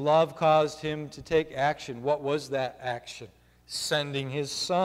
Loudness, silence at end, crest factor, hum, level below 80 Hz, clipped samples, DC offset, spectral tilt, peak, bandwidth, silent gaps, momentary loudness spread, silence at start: -28 LUFS; 0 s; 16 dB; none; -60 dBFS; under 0.1%; under 0.1%; -4.5 dB/octave; -12 dBFS; 15.5 kHz; none; 13 LU; 0 s